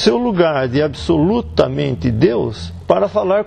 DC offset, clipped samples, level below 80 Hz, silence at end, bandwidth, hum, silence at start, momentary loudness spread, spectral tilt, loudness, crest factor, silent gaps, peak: under 0.1%; under 0.1%; -36 dBFS; 0 s; 9.4 kHz; none; 0 s; 4 LU; -7 dB/octave; -16 LUFS; 16 dB; none; 0 dBFS